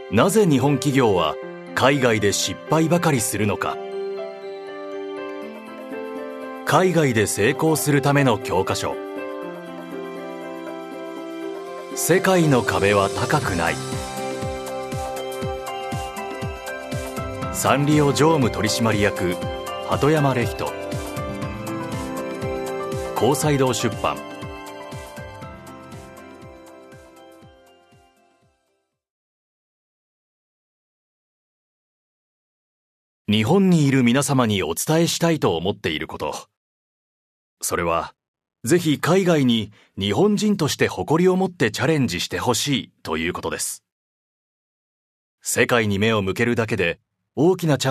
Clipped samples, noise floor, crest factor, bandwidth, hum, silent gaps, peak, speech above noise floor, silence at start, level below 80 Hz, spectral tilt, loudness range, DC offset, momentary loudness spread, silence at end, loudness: under 0.1%; -72 dBFS; 22 dB; 14 kHz; none; 29.10-33.25 s, 36.57-37.57 s, 38.28-38.34 s, 43.92-45.38 s; -2 dBFS; 53 dB; 0 s; -48 dBFS; -5 dB/octave; 9 LU; under 0.1%; 16 LU; 0 s; -21 LUFS